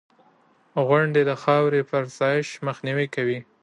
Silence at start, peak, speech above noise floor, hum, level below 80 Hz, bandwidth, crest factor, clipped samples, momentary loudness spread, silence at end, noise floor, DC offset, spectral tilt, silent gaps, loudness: 0.75 s; -6 dBFS; 37 dB; none; -72 dBFS; 10.5 kHz; 18 dB; under 0.1%; 8 LU; 0.2 s; -60 dBFS; under 0.1%; -6.5 dB/octave; none; -23 LUFS